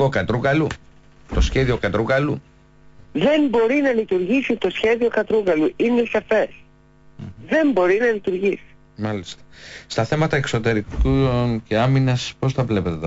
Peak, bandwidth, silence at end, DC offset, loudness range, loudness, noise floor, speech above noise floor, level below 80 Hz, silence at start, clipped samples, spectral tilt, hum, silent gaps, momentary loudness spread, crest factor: -8 dBFS; 8 kHz; 0 s; under 0.1%; 3 LU; -20 LUFS; -50 dBFS; 30 dB; -34 dBFS; 0 s; under 0.1%; -6.5 dB/octave; none; none; 12 LU; 12 dB